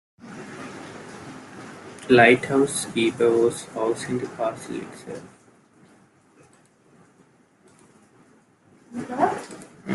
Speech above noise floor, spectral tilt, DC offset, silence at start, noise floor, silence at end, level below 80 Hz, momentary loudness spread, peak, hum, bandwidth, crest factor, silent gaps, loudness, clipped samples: 36 dB; -4.5 dB/octave; under 0.1%; 0.25 s; -58 dBFS; 0 s; -66 dBFS; 24 LU; -2 dBFS; none; 12.5 kHz; 24 dB; none; -22 LUFS; under 0.1%